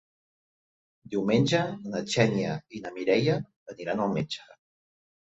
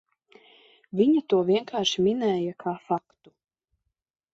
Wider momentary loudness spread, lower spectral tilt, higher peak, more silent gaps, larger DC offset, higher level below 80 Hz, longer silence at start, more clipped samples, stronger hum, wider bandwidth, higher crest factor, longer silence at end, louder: first, 13 LU vs 9 LU; about the same, -6 dB/octave vs -5.5 dB/octave; about the same, -8 dBFS vs -10 dBFS; first, 3.56-3.66 s vs none; neither; about the same, -64 dBFS vs -68 dBFS; first, 1.1 s vs 0.95 s; neither; neither; about the same, 8.2 kHz vs 7.8 kHz; about the same, 22 dB vs 18 dB; second, 0.75 s vs 1.35 s; second, -28 LUFS vs -25 LUFS